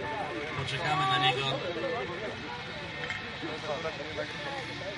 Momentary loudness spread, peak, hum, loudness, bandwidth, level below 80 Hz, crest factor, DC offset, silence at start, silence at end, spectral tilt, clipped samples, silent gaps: 11 LU; -14 dBFS; none; -32 LUFS; 11.5 kHz; -60 dBFS; 20 dB; under 0.1%; 0 s; 0 s; -4.5 dB/octave; under 0.1%; none